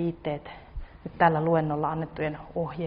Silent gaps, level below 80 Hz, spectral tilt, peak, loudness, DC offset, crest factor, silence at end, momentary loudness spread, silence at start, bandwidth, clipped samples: none; -48 dBFS; -6.5 dB/octave; -8 dBFS; -27 LUFS; under 0.1%; 20 dB; 0 s; 20 LU; 0 s; 5 kHz; under 0.1%